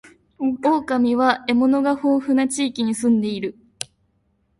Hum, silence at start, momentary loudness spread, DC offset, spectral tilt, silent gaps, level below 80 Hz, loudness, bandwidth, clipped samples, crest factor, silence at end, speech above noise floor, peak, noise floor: none; 0.4 s; 14 LU; under 0.1%; -4.5 dB/octave; none; -60 dBFS; -20 LUFS; 11.5 kHz; under 0.1%; 18 dB; 0.75 s; 47 dB; -4 dBFS; -66 dBFS